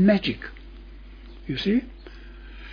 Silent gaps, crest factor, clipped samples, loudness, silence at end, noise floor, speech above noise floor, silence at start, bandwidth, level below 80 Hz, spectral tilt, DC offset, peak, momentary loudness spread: none; 18 dB; under 0.1%; -25 LUFS; 0 s; -42 dBFS; 20 dB; 0 s; 5.4 kHz; -42 dBFS; -8 dB/octave; under 0.1%; -8 dBFS; 22 LU